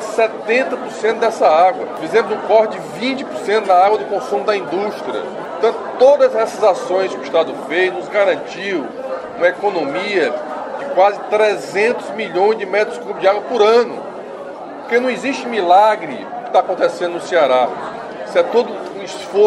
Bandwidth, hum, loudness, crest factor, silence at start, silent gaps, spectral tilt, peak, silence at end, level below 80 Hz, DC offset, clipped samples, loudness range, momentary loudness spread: 12 kHz; none; -16 LUFS; 16 dB; 0 s; none; -4 dB/octave; 0 dBFS; 0 s; -64 dBFS; under 0.1%; under 0.1%; 2 LU; 13 LU